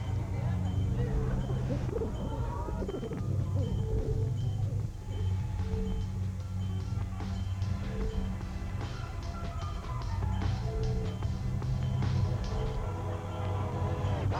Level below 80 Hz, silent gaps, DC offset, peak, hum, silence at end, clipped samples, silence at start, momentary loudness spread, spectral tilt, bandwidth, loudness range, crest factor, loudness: -38 dBFS; none; under 0.1%; -20 dBFS; none; 0 s; under 0.1%; 0 s; 6 LU; -7.5 dB/octave; 9.2 kHz; 3 LU; 12 dB; -34 LUFS